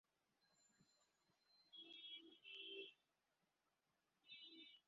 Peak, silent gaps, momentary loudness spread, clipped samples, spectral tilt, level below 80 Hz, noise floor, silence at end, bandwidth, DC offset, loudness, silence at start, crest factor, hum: -44 dBFS; none; 8 LU; under 0.1%; 1 dB/octave; under -90 dBFS; -89 dBFS; 0.05 s; 7.4 kHz; under 0.1%; -58 LUFS; 0.4 s; 20 dB; none